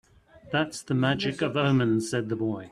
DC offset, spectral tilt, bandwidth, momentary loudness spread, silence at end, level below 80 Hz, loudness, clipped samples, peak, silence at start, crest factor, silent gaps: under 0.1%; -6 dB/octave; 13 kHz; 6 LU; 0 s; -60 dBFS; -27 LUFS; under 0.1%; -10 dBFS; 0.45 s; 18 dB; none